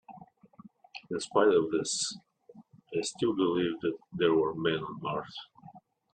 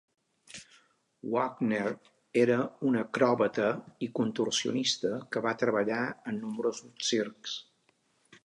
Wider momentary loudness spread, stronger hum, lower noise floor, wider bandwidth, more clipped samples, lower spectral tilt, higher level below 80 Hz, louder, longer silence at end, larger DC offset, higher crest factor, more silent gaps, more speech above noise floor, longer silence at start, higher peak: first, 19 LU vs 12 LU; neither; second, -56 dBFS vs -71 dBFS; about the same, 10 kHz vs 11 kHz; neither; about the same, -4 dB/octave vs -4 dB/octave; first, -70 dBFS vs -76 dBFS; about the same, -30 LUFS vs -30 LUFS; second, 0.35 s vs 0.85 s; neither; about the same, 20 dB vs 22 dB; neither; second, 27 dB vs 41 dB; second, 0.1 s vs 0.55 s; about the same, -12 dBFS vs -10 dBFS